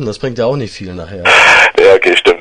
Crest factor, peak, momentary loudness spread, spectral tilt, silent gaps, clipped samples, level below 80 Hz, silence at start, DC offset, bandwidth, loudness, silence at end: 10 dB; 0 dBFS; 19 LU; -3.5 dB/octave; none; 1%; -42 dBFS; 0 s; under 0.1%; 12 kHz; -7 LUFS; 0 s